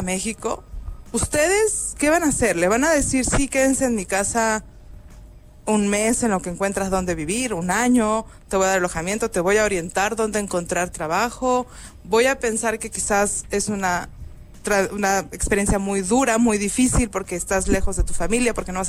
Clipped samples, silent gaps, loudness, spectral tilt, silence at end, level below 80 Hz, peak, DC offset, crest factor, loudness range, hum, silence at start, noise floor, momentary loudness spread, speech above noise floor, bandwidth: under 0.1%; none; -21 LUFS; -4 dB/octave; 0 s; -34 dBFS; -6 dBFS; under 0.1%; 14 dB; 3 LU; none; 0 s; -43 dBFS; 7 LU; 22 dB; 16 kHz